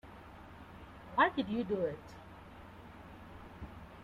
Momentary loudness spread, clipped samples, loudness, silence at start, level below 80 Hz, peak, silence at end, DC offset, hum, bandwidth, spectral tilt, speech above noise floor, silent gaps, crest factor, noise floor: 22 LU; under 0.1%; -34 LUFS; 0.05 s; -60 dBFS; -16 dBFS; 0 s; under 0.1%; none; 15.5 kHz; -7 dB/octave; 19 dB; none; 24 dB; -53 dBFS